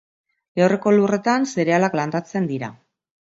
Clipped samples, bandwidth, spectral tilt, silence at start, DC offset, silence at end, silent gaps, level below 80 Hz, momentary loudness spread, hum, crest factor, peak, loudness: under 0.1%; 8 kHz; -6.5 dB/octave; 0.55 s; under 0.1%; 0.6 s; none; -66 dBFS; 11 LU; none; 18 dB; -4 dBFS; -20 LUFS